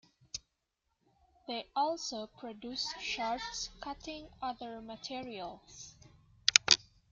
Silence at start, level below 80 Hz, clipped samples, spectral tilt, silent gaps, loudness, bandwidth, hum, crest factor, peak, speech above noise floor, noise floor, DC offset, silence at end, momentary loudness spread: 0.35 s; -64 dBFS; under 0.1%; 0 dB/octave; none; -33 LUFS; 11.5 kHz; none; 36 dB; 0 dBFS; 43 dB; -83 dBFS; under 0.1%; 0.3 s; 20 LU